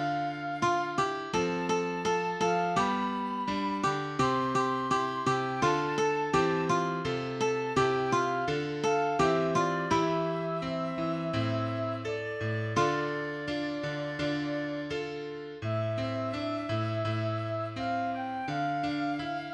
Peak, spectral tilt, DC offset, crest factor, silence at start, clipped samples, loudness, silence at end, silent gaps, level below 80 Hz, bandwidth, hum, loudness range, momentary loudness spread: -14 dBFS; -5.5 dB/octave; under 0.1%; 16 dB; 0 s; under 0.1%; -30 LUFS; 0 s; none; -60 dBFS; 11.5 kHz; none; 5 LU; 6 LU